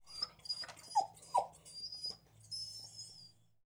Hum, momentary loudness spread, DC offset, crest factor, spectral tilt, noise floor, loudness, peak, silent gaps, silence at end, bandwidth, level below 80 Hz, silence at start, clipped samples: none; 14 LU; under 0.1%; 24 dB; -1 dB/octave; -62 dBFS; -41 LUFS; -18 dBFS; none; 0.4 s; over 20 kHz; -76 dBFS; 0 s; under 0.1%